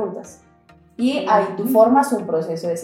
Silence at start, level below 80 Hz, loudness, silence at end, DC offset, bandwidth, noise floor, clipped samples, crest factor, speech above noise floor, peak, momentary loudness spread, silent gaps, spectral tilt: 0 s; -64 dBFS; -18 LUFS; 0 s; under 0.1%; 17 kHz; -52 dBFS; under 0.1%; 16 dB; 33 dB; -2 dBFS; 11 LU; none; -5.5 dB/octave